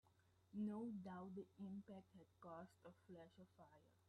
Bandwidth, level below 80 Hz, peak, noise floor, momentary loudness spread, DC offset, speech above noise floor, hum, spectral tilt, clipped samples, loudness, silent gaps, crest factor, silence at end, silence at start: 10.5 kHz; -90 dBFS; -40 dBFS; -78 dBFS; 17 LU; under 0.1%; 22 dB; none; -8.5 dB/octave; under 0.1%; -55 LUFS; none; 16 dB; 0.1 s; 0.05 s